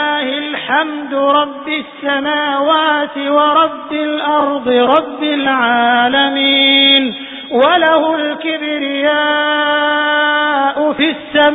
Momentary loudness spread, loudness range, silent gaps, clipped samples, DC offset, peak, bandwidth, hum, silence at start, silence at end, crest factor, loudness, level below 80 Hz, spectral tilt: 8 LU; 3 LU; none; under 0.1%; under 0.1%; 0 dBFS; 4 kHz; none; 0 s; 0 s; 14 dB; -13 LUFS; -58 dBFS; -6 dB/octave